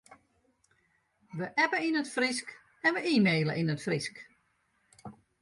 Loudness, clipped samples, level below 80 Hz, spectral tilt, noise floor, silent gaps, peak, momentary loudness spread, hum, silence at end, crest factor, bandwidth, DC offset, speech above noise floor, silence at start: -29 LUFS; under 0.1%; -72 dBFS; -5 dB/octave; -73 dBFS; none; -14 dBFS; 24 LU; none; 0.3 s; 18 dB; 11.5 kHz; under 0.1%; 44 dB; 0.1 s